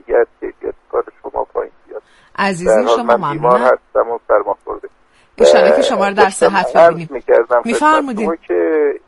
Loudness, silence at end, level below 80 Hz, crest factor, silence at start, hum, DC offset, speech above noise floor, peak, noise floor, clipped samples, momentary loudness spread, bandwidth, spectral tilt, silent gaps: -14 LUFS; 0.1 s; -48 dBFS; 14 dB; 0.1 s; none; under 0.1%; 39 dB; 0 dBFS; -51 dBFS; under 0.1%; 15 LU; 11.5 kHz; -4.5 dB/octave; none